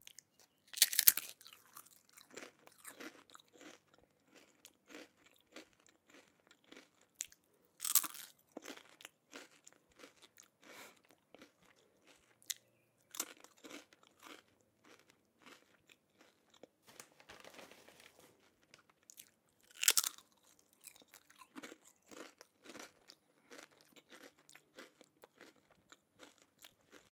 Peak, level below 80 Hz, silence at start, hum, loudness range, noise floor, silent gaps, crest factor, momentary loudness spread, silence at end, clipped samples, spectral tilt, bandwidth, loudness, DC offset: 0 dBFS; under -90 dBFS; 0.75 s; none; 22 LU; -75 dBFS; none; 46 dB; 29 LU; 0.45 s; under 0.1%; 2 dB/octave; 18 kHz; -34 LUFS; under 0.1%